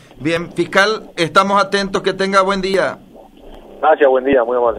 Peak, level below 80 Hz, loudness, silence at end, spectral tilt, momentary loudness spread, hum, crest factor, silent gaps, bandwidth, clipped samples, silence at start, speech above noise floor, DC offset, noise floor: 0 dBFS; -44 dBFS; -15 LUFS; 0 s; -4.5 dB/octave; 7 LU; none; 16 dB; none; 15.5 kHz; under 0.1%; 0.2 s; 24 dB; under 0.1%; -39 dBFS